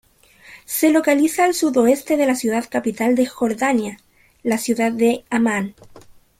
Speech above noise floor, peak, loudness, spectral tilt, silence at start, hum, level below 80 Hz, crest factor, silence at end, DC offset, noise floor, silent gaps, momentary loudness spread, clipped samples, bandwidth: 30 dB; -4 dBFS; -19 LUFS; -4 dB/octave; 0.5 s; none; -58 dBFS; 14 dB; 0.4 s; under 0.1%; -48 dBFS; none; 8 LU; under 0.1%; 16.5 kHz